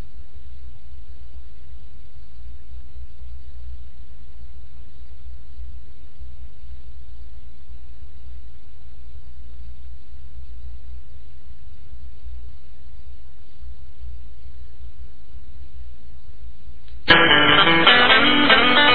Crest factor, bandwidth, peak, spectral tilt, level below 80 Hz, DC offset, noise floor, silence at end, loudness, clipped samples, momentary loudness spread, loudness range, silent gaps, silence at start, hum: 24 dB; 5.4 kHz; 0 dBFS; -6.5 dB/octave; -40 dBFS; 10%; -46 dBFS; 0 s; -13 LUFS; under 0.1%; 31 LU; 28 LU; none; 1.1 s; none